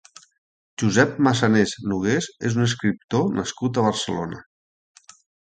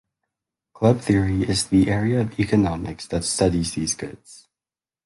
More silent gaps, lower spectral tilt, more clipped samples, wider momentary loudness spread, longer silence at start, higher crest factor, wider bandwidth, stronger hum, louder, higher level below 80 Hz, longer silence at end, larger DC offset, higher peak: first, 3.04-3.08 s vs none; about the same, -5 dB/octave vs -5.5 dB/octave; neither; about the same, 9 LU vs 8 LU; about the same, 0.8 s vs 0.75 s; about the same, 22 dB vs 18 dB; second, 9.4 kHz vs 11.5 kHz; neither; about the same, -22 LUFS vs -21 LUFS; second, -54 dBFS vs -40 dBFS; first, 1.05 s vs 0.7 s; neither; about the same, -2 dBFS vs -4 dBFS